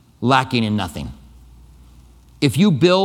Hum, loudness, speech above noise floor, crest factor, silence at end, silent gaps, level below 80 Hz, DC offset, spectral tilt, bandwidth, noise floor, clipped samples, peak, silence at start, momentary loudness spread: none; -18 LUFS; 30 dB; 18 dB; 0 s; none; -44 dBFS; under 0.1%; -6 dB/octave; 16.5 kHz; -46 dBFS; under 0.1%; 0 dBFS; 0.2 s; 15 LU